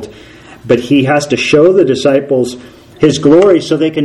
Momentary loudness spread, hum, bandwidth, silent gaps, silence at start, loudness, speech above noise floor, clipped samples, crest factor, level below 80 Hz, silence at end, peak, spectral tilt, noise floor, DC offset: 7 LU; none; 12 kHz; none; 0 s; -10 LUFS; 26 dB; 0.8%; 10 dB; -46 dBFS; 0 s; 0 dBFS; -5.5 dB/octave; -35 dBFS; under 0.1%